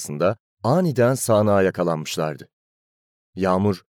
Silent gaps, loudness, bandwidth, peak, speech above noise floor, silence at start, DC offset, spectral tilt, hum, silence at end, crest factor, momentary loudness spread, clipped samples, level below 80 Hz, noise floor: 0.40-0.57 s, 2.53-3.33 s; -21 LUFS; 18 kHz; -6 dBFS; over 70 dB; 0 s; under 0.1%; -6 dB/octave; none; 0.15 s; 16 dB; 10 LU; under 0.1%; -64 dBFS; under -90 dBFS